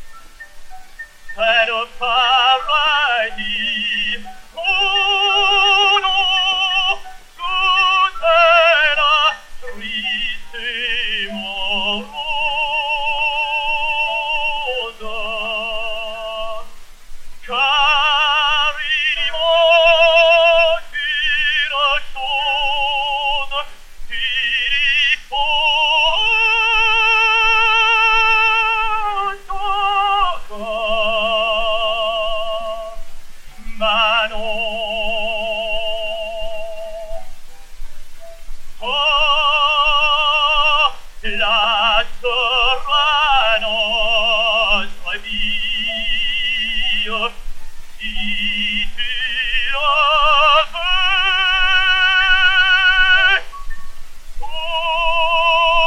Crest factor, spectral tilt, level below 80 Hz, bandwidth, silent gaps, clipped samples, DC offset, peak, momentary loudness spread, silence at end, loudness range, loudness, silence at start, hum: 16 dB; -1.5 dB/octave; -32 dBFS; 11.5 kHz; none; under 0.1%; under 0.1%; 0 dBFS; 13 LU; 0 s; 7 LU; -15 LUFS; 0 s; none